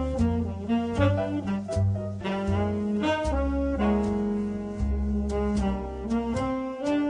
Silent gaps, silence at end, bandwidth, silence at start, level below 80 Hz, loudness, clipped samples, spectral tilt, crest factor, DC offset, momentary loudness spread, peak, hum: none; 0 s; 10.5 kHz; 0 s; -36 dBFS; -27 LUFS; under 0.1%; -7.5 dB/octave; 18 dB; under 0.1%; 5 LU; -10 dBFS; none